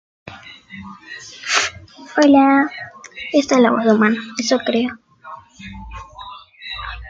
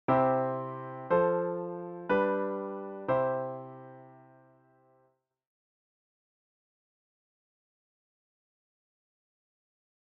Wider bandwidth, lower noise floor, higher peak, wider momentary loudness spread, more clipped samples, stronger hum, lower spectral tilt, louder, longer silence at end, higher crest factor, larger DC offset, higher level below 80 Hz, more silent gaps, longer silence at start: first, 9 kHz vs 4.2 kHz; second, -39 dBFS vs -72 dBFS; first, -2 dBFS vs -14 dBFS; first, 24 LU vs 15 LU; neither; neither; second, -4 dB/octave vs -6.5 dB/octave; first, -16 LUFS vs -31 LUFS; second, 0 s vs 5.85 s; about the same, 18 dB vs 20 dB; neither; first, -46 dBFS vs -72 dBFS; neither; first, 0.25 s vs 0.1 s